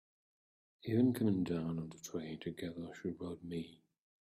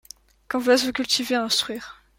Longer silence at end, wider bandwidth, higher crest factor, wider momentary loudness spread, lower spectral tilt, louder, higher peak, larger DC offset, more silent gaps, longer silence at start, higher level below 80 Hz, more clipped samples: first, 0.5 s vs 0.25 s; about the same, 15.5 kHz vs 16.5 kHz; about the same, 18 dB vs 18 dB; first, 13 LU vs 10 LU; first, -7 dB/octave vs -1.5 dB/octave; second, -39 LUFS vs -22 LUFS; second, -20 dBFS vs -8 dBFS; neither; neither; first, 0.85 s vs 0.5 s; second, -72 dBFS vs -60 dBFS; neither